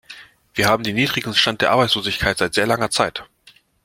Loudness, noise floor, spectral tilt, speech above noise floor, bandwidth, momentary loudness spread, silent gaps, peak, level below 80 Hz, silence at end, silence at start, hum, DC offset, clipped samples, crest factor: -18 LUFS; -53 dBFS; -3.5 dB/octave; 34 dB; 16.5 kHz; 5 LU; none; 0 dBFS; -46 dBFS; 0.6 s; 0.1 s; none; under 0.1%; under 0.1%; 20 dB